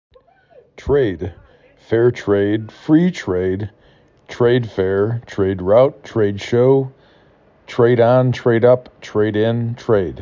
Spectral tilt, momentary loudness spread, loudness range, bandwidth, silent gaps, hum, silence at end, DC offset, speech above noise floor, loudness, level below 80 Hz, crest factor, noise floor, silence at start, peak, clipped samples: -8 dB/octave; 10 LU; 3 LU; 7.6 kHz; none; none; 0 s; under 0.1%; 36 dB; -17 LUFS; -42 dBFS; 16 dB; -52 dBFS; 0.8 s; -2 dBFS; under 0.1%